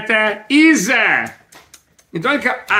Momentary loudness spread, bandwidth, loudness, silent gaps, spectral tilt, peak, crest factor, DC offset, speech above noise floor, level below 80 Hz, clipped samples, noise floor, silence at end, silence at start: 12 LU; 16 kHz; -14 LUFS; none; -3 dB/octave; 0 dBFS; 16 dB; under 0.1%; 34 dB; -62 dBFS; under 0.1%; -49 dBFS; 0 s; 0 s